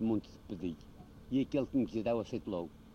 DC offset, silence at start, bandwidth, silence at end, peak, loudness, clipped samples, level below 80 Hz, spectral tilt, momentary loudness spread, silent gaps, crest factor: under 0.1%; 0 s; 8 kHz; 0 s; -22 dBFS; -36 LUFS; under 0.1%; -58 dBFS; -8 dB/octave; 16 LU; none; 14 dB